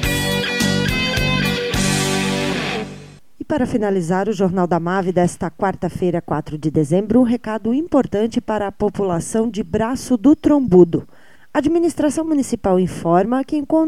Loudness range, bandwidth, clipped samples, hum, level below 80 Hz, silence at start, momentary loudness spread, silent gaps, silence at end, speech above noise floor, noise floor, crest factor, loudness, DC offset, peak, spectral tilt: 3 LU; 16 kHz; under 0.1%; none; -38 dBFS; 0 s; 7 LU; none; 0 s; 21 dB; -38 dBFS; 18 dB; -18 LUFS; 0.8%; 0 dBFS; -5.5 dB/octave